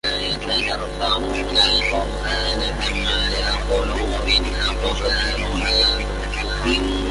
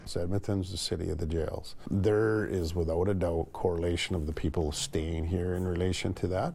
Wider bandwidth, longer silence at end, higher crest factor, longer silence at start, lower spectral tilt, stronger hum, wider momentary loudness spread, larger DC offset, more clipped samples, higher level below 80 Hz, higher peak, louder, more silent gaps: second, 11.5 kHz vs 15 kHz; about the same, 0 s vs 0 s; about the same, 16 dB vs 16 dB; about the same, 0.05 s vs 0 s; second, -3.5 dB/octave vs -6 dB/octave; first, 50 Hz at -25 dBFS vs none; about the same, 7 LU vs 5 LU; neither; neither; first, -26 dBFS vs -46 dBFS; first, -4 dBFS vs -14 dBFS; first, -20 LUFS vs -31 LUFS; neither